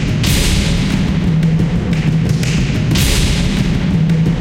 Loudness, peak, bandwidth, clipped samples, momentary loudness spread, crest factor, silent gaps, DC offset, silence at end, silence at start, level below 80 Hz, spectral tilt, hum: -14 LUFS; 0 dBFS; 16.5 kHz; under 0.1%; 2 LU; 12 dB; none; under 0.1%; 0 s; 0 s; -20 dBFS; -5.5 dB/octave; none